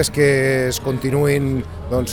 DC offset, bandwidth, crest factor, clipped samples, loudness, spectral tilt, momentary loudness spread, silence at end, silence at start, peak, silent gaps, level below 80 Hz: 0.4%; 17.5 kHz; 14 dB; under 0.1%; -18 LUFS; -5.5 dB/octave; 8 LU; 0 s; 0 s; -4 dBFS; none; -36 dBFS